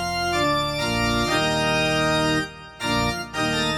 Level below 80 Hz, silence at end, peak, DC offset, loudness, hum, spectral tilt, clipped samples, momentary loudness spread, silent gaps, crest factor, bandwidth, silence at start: -40 dBFS; 0 s; -8 dBFS; under 0.1%; -22 LUFS; none; -4 dB/octave; under 0.1%; 5 LU; none; 14 dB; 18 kHz; 0 s